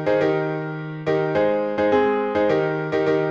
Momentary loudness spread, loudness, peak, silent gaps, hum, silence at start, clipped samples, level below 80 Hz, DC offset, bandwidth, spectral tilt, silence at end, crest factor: 7 LU; -21 LUFS; -6 dBFS; none; none; 0 s; under 0.1%; -56 dBFS; under 0.1%; 7.2 kHz; -8 dB/octave; 0 s; 14 dB